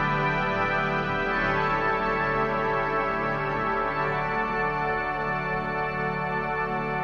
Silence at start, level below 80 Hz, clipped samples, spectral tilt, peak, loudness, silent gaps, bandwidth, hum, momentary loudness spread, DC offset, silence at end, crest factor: 0 s; -44 dBFS; under 0.1%; -7 dB/octave; -12 dBFS; -26 LUFS; none; 7.4 kHz; none; 3 LU; under 0.1%; 0 s; 14 dB